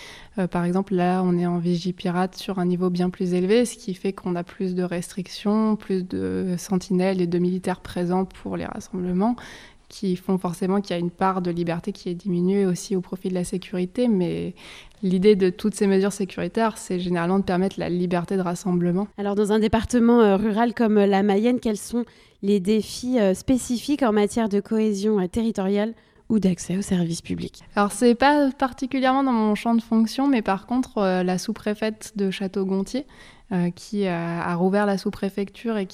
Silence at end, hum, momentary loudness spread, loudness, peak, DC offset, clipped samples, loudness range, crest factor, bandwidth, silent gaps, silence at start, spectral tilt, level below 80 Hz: 0 s; none; 9 LU; -23 LUFS; -6 dBFS; under 0.1%; under 0.1%; 5 LU; 18 dB; 14.5 kHz; none; 0 s; -6.5 dB/octave; -50 dBFS